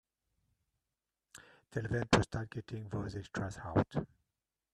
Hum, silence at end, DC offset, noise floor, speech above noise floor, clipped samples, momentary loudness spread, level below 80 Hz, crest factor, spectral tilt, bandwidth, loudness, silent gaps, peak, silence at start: none; 0.7 s; under 0.1%; under -90 dBFS; over 54 dB; under 0.1%; 22 LU; -56 dBFS; 28 dB; -6 dB/octave; 12 kHz; -36 LUFS; none; -10 dBFS; 1.35 s